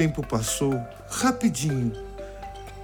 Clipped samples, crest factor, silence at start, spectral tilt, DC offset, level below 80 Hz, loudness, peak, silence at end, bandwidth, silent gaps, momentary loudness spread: under 0.1%; 18 dB; 0 s; -5 dB/octave; under 0.1%; -44 dBFS; -26 LUFS; -10 dBFS; 0 s; 19.5 kHz; none; 16 LU